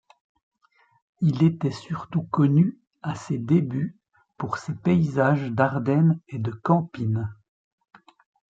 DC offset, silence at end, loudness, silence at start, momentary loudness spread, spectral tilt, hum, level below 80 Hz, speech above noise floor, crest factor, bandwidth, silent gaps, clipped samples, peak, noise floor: under 0.1%; 1.2 s; -24 LUFS; 1.2 s; 12 LU; -8.5 dB/octave; none; -62 dBFS; 41 dB; 20 dB; 7.8 kHz; 2.87-2.91 s; under 0.1%; -6 dBFS; -64 dBFS